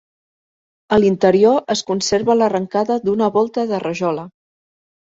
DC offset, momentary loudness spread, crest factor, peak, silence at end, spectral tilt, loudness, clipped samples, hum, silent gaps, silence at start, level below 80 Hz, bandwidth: under 0.1%; 8 LU; 16 dB; -2 dBFS; 0.85 s; -5 dB/octave; -17 LUFS; under 0.1%; none; none; 0.9 s; -54 dBFS; 8 kHz